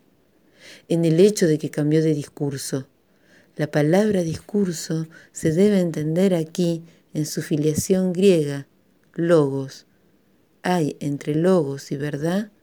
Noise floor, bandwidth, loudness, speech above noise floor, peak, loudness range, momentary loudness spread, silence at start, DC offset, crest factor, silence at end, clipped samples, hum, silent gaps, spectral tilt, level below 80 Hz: -61 dBFS; over 20 kHz; -21 LUFS; 40 dB; -4 dBFS; 3 LU; 12 LU; 0.65 s; under 0.1%; 18 dB; 0.15 s; under 0.1%; none; none; -6.5 dB/octave; -58 dBFS